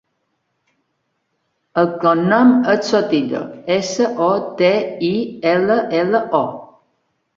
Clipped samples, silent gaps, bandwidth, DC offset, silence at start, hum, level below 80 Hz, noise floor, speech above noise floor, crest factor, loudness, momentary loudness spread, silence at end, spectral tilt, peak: under 0.1%; none; 7.6 kHz; under 0.1%; 1.75 s; none; -60 dBFS; -70 dBFS; 54 dB; 16 dB; -17 LUFS; 8 LU; 0.7 s; -5.5 dB/octave; -2 dBFS